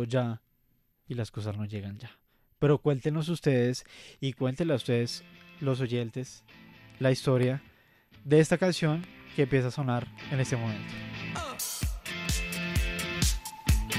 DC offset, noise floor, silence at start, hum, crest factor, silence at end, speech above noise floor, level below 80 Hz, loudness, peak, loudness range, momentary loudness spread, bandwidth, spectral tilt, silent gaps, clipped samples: under 0.1%; -70 dBFS; 0 s; none; 20 dB; 0 s; 41 dB; -42 dBFS; -30 LUFS; -10 dBFS; 4 LU; 13 LU; 15.5 kHz; -5.5 dB/octave; none; under 0.1%